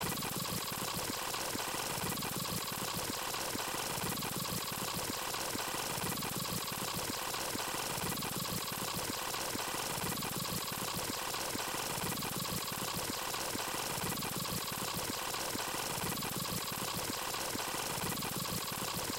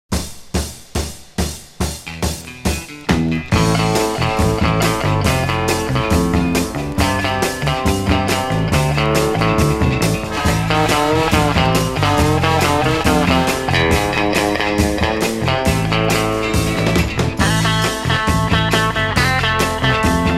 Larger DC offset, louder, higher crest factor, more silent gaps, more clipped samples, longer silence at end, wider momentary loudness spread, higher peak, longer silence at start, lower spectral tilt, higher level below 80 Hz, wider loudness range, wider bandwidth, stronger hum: neither; second, -36 LUFS vs -16 LUFS; about the same, 14 dB vs 16 dB; neither; neither; about the same, 0 s vs 0 s; second, 1 LU vs 9 LU; second, -24 dBFS vs 0 dBFS; about the same, 0 s vs 0.1 s; second, -2.5 dB/octave vs -5 dB/octave; second, -60 dBFS vs -28 dBFS; second, 0 LU vs 3 LU; about the same, 17 kHz vs 16 kHz; neither